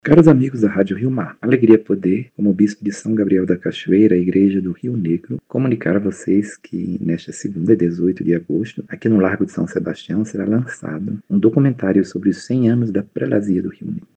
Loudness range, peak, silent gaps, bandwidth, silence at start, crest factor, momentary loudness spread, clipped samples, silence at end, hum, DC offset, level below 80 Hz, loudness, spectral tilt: 4 LU; 0 dBFS; none; 9 kHz; 0.05 s; 16 dB; 11 LU; under 0.1%; 0.15 s; none; under 0.1%; -54 dBFS; -18 LUFS; -8 dB/octave